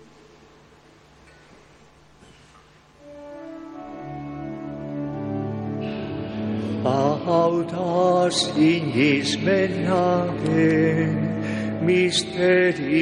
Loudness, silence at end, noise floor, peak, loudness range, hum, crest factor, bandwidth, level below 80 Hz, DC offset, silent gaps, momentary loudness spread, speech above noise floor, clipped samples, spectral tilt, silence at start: -22 LUFS; 0 s; -52 dBFS; -8 dBFS; 17 LU; none; 16 dB; 11 kHz; -56 dBFS; under 0.1%; none; 16 LU; 32 dB; under 0.1%; -5.5 dB/octave; 3.05 s